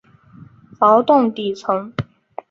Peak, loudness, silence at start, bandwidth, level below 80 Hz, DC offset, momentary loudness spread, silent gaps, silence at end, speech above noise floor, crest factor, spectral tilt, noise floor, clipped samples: -2 dBFS; -17 LUFS; 0.8 s; 7.6 kHz; -56 dBFS; under 0.1%; 17 LU; none; 0.5 s; 29 dB; 16 dB; -7 dB/octave; -45 dBFS; under 0.1%